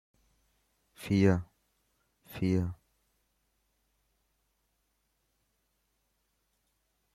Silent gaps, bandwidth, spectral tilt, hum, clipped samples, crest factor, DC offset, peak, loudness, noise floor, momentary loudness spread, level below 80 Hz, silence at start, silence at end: none; 14.5 kHz; -8 dB/octave; none; under 0.1%; 24 dB; under 0.1%; -12 dBFS; -30 LUFS; -78 dBFS; 19 LU; -64 dBFS; 1 s; 4.4 s